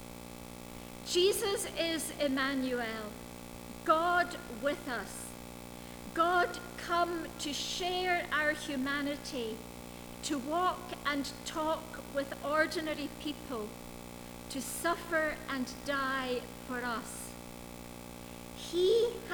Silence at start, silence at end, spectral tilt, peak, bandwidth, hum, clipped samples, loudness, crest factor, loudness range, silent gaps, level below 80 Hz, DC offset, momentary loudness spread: 0 s; 0 s; -3 dB/octave; -14 dBFS; over 20 kHz; 60 Hz at -55 dBFS; under 0.1%; -34 LUFS; 20 dB; 4 LU; none; -58 dBFS; under 0.1%; 17 LU